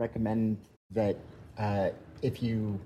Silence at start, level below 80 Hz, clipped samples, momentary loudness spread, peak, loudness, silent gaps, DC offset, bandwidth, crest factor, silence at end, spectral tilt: 0 s; -56 dBFS; under 0.1%; 8 LU; -16 dBFS; -33 LUFS; 0.77-0.90 s; under 0.1%; 13 kHz; 16 dB; 0 s; -9 dB/octave